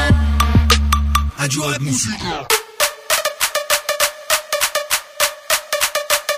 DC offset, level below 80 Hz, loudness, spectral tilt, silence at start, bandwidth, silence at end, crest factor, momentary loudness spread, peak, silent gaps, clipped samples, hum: under 0.1%; -24 dBFS; -17 LUFS; -3 dB/octave; 0 s; 16 kHz; 0 s; 18 dB; 5 LU; 0 dBFS; none; under 0.1%; none